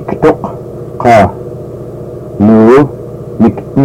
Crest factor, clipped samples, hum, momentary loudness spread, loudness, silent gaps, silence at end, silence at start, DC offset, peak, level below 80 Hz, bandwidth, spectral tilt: 10 dB; 0.8%; none; 19 LU; -8 LUFS; none; 0 s; 0 s; under 0.1%; 0 dBFS; -36 dBFS; 10.5 kHz; -8.5 dB/octave